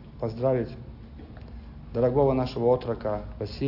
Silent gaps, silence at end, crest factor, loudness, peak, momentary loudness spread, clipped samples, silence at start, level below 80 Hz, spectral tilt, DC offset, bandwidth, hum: none; 0 s; 16 dB; -27 LUFS; -10 dBFS; 21 LU; under 0.1%; 0 s; -44 dBFS; -9.5 dB/octave; under 0.1%; 5.8 kHz; none